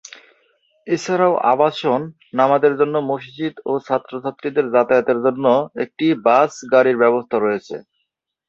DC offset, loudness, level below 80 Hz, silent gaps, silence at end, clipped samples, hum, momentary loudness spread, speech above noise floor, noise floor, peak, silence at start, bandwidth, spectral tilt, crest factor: under 0.1%; -18 LUFS; -66 dBFS; none; 0.7 s; under 0.1%; none; 11 LU; 57 dB; -74 dBFS; -2 dBFS; 0.85 s; 7.8 kHz; -6 dB/octave; 16 dB